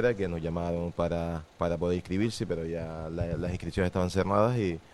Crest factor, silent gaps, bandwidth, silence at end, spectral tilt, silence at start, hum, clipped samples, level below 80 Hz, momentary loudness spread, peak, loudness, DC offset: 18 dB; none; 12.5 kHz; 0.05 s; -7 dB/octave; 0 s; none; under 0.1%; -50 dBFS; 8 LU; -10 dBFS; -30 LUFS; under 0.1%